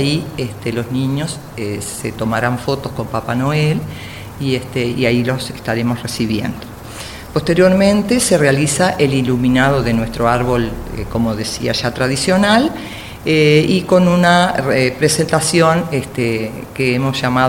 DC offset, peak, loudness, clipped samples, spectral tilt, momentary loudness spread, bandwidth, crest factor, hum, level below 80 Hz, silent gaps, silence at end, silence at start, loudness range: under 0.1%; 0 dBFS; -15 LUFS; under 0.1%; -5 dB/octave; 12 LU; 17 kHz; 16 dB; none; -36 dBFS; none; 0 s; 0 s; 6 LU